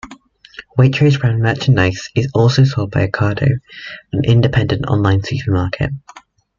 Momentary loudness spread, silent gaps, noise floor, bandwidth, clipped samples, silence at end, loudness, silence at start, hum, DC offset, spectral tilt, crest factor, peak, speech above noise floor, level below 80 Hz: 10 LU; none; -42 dBFS; 7.4 kHz; under 0.1%; 0.4 s; -15 LUFS; 0.05 s; none; under 0.1%; -7 dB/octave; 14 dB; -2 dBFS; 27 dB; -40 dBFS